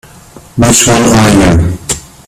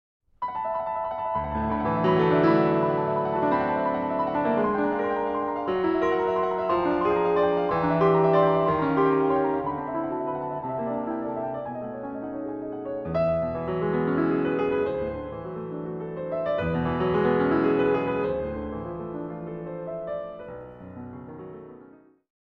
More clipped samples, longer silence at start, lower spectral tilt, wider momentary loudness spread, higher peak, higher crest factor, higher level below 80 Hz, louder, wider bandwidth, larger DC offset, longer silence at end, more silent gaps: first, 0.2% vs under 0.1%; about the same, 0.35 s vs 0.4 s; second, -4.5 dB/octave vs -9.5 dB/octave; about the same, 11 LU vs 13 LU; first, 0 dBFS vs -10 dBFS; second, 8 dB vs 16 dB; first, -24 dBFS vs -50 dBFS; first, -7 LUFS vs -26 LUFS; first, over 20 kHz vs 6.2 kHz; neither; second, 0.25 s vs 0.6 s; neither